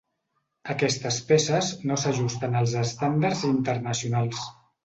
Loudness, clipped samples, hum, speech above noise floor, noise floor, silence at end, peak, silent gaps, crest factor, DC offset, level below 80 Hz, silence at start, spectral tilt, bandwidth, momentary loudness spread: -25 LUFS; under 0.1%; none; 51 dB; -76 dBFS; 0.35 s; -8 dBFS; none; 18 dB; under 0.1%; -60 dBFS; 0.65 s; -5 dB/octave; 8.2 kHz; 8 LU